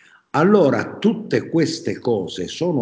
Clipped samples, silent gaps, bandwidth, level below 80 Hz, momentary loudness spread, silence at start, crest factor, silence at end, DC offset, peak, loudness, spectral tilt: under 0.1%; none; 8 kHz; -58 dBFS; 9 LU; 0.35 s; 18 dB; 0 s; under 0.1%; -2 dBFS; -19 LUFS; -6.5 dB/octave